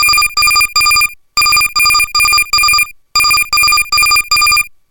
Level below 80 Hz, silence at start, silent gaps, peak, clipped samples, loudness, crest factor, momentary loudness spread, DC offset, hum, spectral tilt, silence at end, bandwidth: -36 dBFS; 0 s; none; 0 dBFS; under 0.1%; -8 LUFS; 10 dB; 3 LU; under 0.1%; none; 2.5 dB/octave; 0.25 s; 18.5 kHz